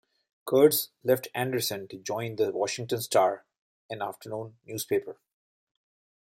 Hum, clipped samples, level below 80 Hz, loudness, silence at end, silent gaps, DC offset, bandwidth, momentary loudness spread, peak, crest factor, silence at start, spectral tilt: none; under 0.1%; -74 dBFS; -28 LUFS; 1.15 s; 3.58-3.89 s; under 0.1%; 16.5 kHz; 16 LU; -8 dBFS; 22 dB; 0.45 s; -4 dB/octave